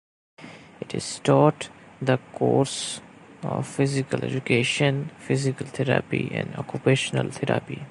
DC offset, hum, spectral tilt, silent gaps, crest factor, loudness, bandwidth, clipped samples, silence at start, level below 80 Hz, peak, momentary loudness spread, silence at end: under 0.1%; none; -5.5 dB/octave; none; 22 dB; -25 LUFS; 11.5 kHz; under 0.1%; 0.4 s; -60 dBFS; -4 dBFS; 14 LU; 0 s